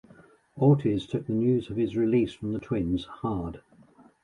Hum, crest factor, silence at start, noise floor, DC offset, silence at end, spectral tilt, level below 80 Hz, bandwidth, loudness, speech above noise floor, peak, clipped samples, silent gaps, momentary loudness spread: none; 18 dB; 0.55 s; -57 dBFS; under 0.1%; 0.65 s; -9 dB/octave; -50 dBFS; 10.5 kHz; -27 LUFS; 31 dB; -10 dBFS; under 0.1%; none; 11 LU